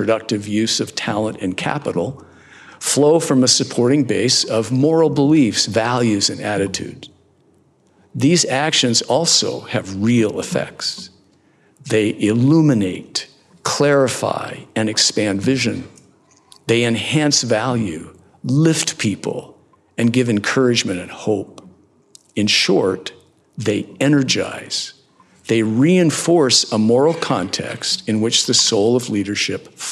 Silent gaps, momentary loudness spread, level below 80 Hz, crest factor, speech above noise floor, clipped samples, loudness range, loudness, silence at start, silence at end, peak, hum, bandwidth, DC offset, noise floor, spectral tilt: none; 12 LU; -66 dBFS; 18 dB; 39 dB; under 0.1%; 4 LU; -17 LUFS; 0 s; 0 s; 0 dBFS; none; 13.5 kHz; under 0.1%; -56 dBFS; -4 dB/octave